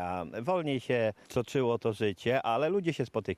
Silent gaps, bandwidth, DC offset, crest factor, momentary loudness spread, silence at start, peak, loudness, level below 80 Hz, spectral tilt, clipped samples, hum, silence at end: none; 14.5 kHz; under 0.1%; 16 dB; 5 LU; 0 s; -16 dBFS; -31 LUFS; -64 dBFS; -6.5 dB/octave; under 0.1%; none; 0 s